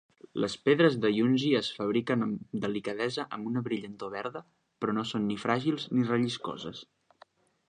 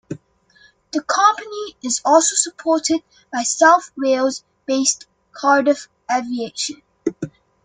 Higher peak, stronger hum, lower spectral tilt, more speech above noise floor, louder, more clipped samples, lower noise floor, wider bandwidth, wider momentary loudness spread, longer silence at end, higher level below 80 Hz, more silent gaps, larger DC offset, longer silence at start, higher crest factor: second, -10 dBFS vs 0 dBFS; neither; first, -6 dB/octave vs -2 dB/octave; second, 32 dB vs 36 dB; second, -30 LUFS vs -18 LUFS; neither; first, -61 dBFS vs -54 dBFS; about the same, 9.8 kHz vs 10 kHz; about the same, 13 LU vs 14 LU; first, 0.85 s vs 0.35 s; about the same, -70 dBFS vs -66 dBFS; neither; neither; first, 0.35 s vs 0.1 s; about the same, 20 dB vs 18 dB